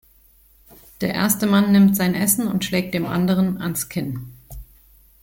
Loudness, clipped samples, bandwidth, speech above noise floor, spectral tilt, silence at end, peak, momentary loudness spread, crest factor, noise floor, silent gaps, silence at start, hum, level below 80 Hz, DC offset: -19 LUFS; under 0.1%; 17 kHz; 35 dB; -5 dB/octave; 0.6 s; -4 dBFS; 13 LU; 18 dB; -54 dBFS; none; 1 s; none; -48 dBFS; under 0.1%